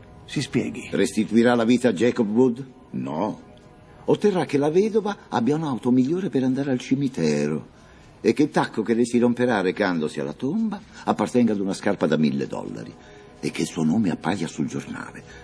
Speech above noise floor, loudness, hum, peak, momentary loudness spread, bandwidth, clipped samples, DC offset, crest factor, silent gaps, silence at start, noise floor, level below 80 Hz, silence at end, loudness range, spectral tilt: 26 dB; -23 LUFS; none; -4 dBFS; 12 LU; 11 kHz; under 0.1%; under 0.1%; 18 dB; none; 0 s; -48 dBFS; -58 dBFS; 0 s; 3 LU; -6 dB/octave